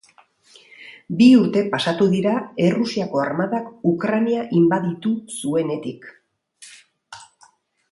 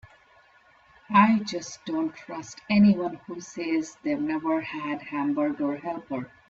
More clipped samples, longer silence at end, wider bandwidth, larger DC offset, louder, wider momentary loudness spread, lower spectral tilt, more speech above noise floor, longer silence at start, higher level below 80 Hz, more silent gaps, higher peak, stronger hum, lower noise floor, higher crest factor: neither; first, 0.65 s vs 0.2 s; first, 11.5 kHz vs 7.6 kHz; neither; first, -19 LUFS vs -26 LUFS; about the same, 14 LU vs 15 LU; about the same, -6.5 dB/octave vs -6 dB/octave; first, 37 dB vs 33 dB; second, 0.8 s vs 1.1 s; about the same, -66 dBFS vs -64 dBFS; neither; first, -2 dBFS vs -6 dBFS; neither; about the same, -56 dBFS vs -58 dBFS; about the same, 18 dB vs 20 dB